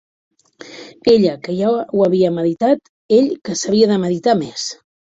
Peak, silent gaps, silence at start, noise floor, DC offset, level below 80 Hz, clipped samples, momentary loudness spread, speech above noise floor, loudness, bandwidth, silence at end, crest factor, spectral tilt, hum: -2 dBFS; 2.89-3.09 s; 0.65 s; -39 dBFS; under 0.1%; -56 dBFS; under 0.1%; 11 LU; 23 dB; -16 LUFS; 8 kHz; 0.3 s; 16 dB; -5.5 dB/octave; none